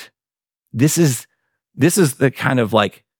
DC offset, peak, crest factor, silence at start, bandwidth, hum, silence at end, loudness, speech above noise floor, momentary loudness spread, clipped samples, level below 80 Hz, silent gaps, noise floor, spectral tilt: under 0.1%; -2 dBFS; 18 dB; 0 s; 19.5 kHz; none; 0.3 s; -17 LUFS; over 74 dB; 4 LU; under 0.1%; -62 dBFS; none; under -90 dBFS; -5 dB/octave